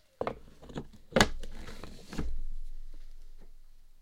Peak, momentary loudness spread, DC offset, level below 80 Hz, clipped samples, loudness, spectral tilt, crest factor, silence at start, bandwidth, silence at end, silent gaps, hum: -4 dBFS; 24 LU; under 0.1%; -40 dBFS; under 0.1%; -34 LUFS; -4 dB/octave; 30 dB; 0.2 s; 16.5 kHz; 0 s; none; none